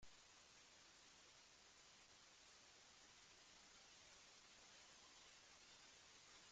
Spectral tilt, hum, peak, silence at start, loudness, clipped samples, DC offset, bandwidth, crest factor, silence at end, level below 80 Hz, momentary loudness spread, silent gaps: -0.5 dB/octave; none; -52 dBFS; 0 s; -66 LUFS; under 0.1%; under 0.1%; 9 kHz; 16 dB; 0 s; -86 dBFS; 2 LU; none